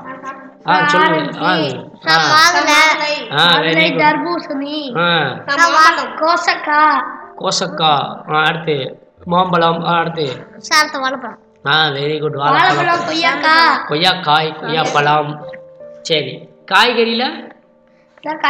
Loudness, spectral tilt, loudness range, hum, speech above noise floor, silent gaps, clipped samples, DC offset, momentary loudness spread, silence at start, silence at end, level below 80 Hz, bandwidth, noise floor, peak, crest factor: -13 LUFS; -3.5 dB/octave; 4 LU; none; 36 dB; none; 0.1%; under 0.1%; 16 LU; 0 s; 0 s; -62 dBFS; over 20 kHz; -50 dBFS; 0 dBFS; 14 dB